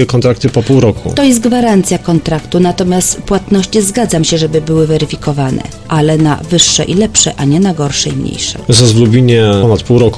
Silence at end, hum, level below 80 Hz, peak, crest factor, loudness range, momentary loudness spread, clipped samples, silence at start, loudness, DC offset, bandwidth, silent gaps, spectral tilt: 0 s; none; -32 dBFS; 0 dBFS; 10 dB; 2 LU; 7 LU; 0.2%; 0 s; -10 LUFS; under 0.1%; 11 kHz; none; -5 dB/octave